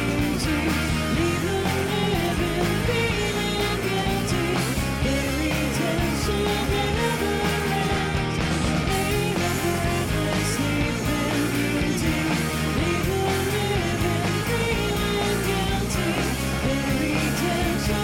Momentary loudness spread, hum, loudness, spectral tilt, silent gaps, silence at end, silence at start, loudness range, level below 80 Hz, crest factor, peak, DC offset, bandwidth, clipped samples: 1 LU; none; -23 LUFS; -5 dB/octave; none; 0 s; 0 s; 0 LU; -34 dBFS; 10 dB; -12 dBFS; under 0.1%; 17.5 kHz; under 0.1%